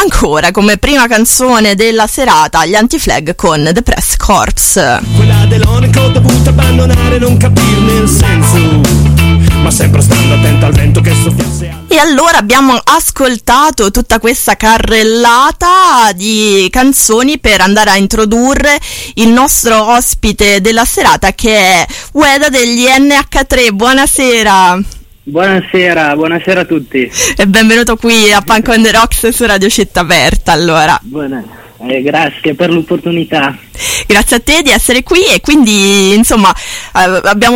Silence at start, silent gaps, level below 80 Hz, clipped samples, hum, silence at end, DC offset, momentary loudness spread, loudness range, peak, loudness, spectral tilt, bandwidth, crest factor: 0 s; none; -20 dBFS; 0.4%; none; 0 s; under 0.1%; 6 LU; 3 LU; 0 dBFS; -7 LUFS; -4 dB/octave; 17 kHz; 8 dB